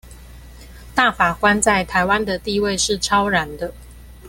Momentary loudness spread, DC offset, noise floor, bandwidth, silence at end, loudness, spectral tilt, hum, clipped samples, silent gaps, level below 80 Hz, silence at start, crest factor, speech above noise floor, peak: 9 LU; under 0.1%; -40 dBFS; 17 kHz; 0 s; -18 LUFS; -3 dB/octave; none; under 0.1%; none; -40 dBFS; 0.05 s; 18 dB; 21 dB; -2 dBFS